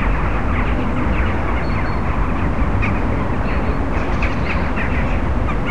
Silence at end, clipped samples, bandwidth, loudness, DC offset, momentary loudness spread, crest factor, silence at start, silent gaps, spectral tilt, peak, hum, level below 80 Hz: 0 s; under 0.1%; 8.2 kHz; -20 LUFS; 7%; 2 LU; 12 dB; 0 s; none; -8 dB/octave; -6 dBFS; none; -22 dBFS